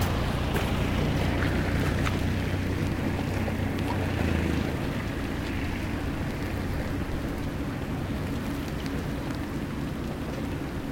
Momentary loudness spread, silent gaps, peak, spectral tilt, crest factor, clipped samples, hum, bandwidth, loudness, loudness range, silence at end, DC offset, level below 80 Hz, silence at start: 6 LU; none; -12 dBFS; -6.5 dB/octave; 16 dB; under 0.1%; none; 17 kHz; -30 LUFS; 4 LU; 0 s; under 0.1%; -36 dBFS; 0 s